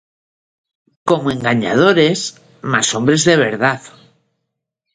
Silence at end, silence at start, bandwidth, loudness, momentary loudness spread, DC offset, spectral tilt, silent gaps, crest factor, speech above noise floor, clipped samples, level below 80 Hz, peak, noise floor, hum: 1.05 s; 1.05 s; 11 kHz; -15 LUFS; 14 LU; under 0.1%; -4 dB/octave; none; 18 dB; 62 dB; under 0.1%; -56 dBFS; 0 dBFS; -76 dBFS; none